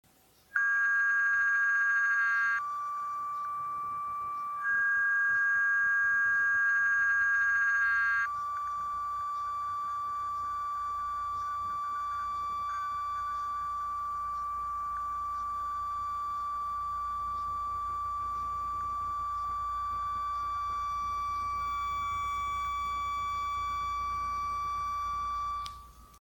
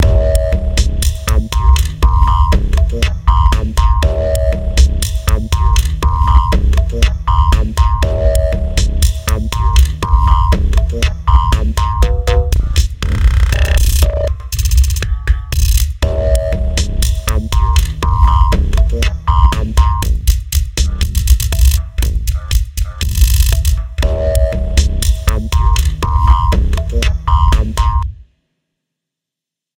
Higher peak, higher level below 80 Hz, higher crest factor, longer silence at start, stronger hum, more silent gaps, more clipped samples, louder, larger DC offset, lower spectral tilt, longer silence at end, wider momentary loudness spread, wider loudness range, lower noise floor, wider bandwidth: second, -16 dBFS vs 0 dBFS; second, -56 dBFS vs -12 dBFS; about the same, 16 dB vs 12 dB; first, 0.55 s vs 0 s; neither; neither; second, under 0.1% vs 0.1%; second, -30 LUFS vs -14 LUFS; neither; second, -2 dB/octave vs -5 dB/octave; second, 0.05 s vs 1.55 s; first, 9 LU vs 5 LU; first, 8 LU vs 2 LU; second, -62 dBFS vs -84 dBFS; about the same, 17.5 kHz vs 17 kHz